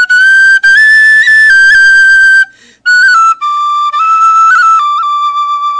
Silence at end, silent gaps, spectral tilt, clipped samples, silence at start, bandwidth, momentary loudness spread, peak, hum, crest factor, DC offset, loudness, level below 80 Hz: 0 s; none; 2.5 dB/octave; under 0.1%; 0 s; 11 kHz; 9 LU; 0 dBFS; none; 6 dB; under 0.1%; -4 LUFS; -48 dBFS